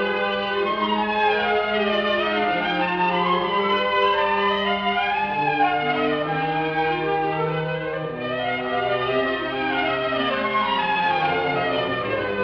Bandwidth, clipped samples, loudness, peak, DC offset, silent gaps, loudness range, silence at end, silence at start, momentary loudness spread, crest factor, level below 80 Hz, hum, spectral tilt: 6.4 kHz; under 0.1%; -22 LUFS; -8 dBFS; under 0.1%; none; 3 LU; 0 s; 0 s; 4 LU; 14 dB; -52 dBFS; none; -7 dB/octave